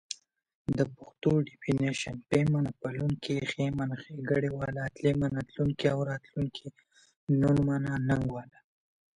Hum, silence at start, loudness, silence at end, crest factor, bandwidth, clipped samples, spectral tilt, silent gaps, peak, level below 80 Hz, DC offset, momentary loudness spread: none; 0.1 s; -31 LUFS; 0.65 s; 20 dB; 11 kHz; under 0.1%; -7 dB/octave; 0.55-0.65 s, 7.16-7.27 s; -12 dBFS; -54 dBFS; under 0.1%; 9 LU